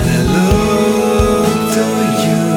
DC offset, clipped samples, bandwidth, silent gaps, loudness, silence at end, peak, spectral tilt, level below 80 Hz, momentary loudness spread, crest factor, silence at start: under 0.1%; under 0.1%; 19 kHz; none; -13 LUFS; 0 s; -2 dBFS; -5.5 dB/octave; -26 dBFS; 2 LU; 12 dB; 0 s